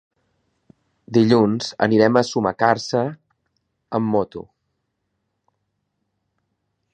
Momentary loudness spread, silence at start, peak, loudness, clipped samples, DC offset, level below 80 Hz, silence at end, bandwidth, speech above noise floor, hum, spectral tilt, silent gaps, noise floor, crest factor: 12 LU; 1.1 s; 0 dBFS; -19 LUFS; under 0.1%; under 0.1%; -60 dBFS; 2.5 s; 9.2 kHz; 57 dB; none; -6 dB/octave; none; -75 dBFS; 22 dB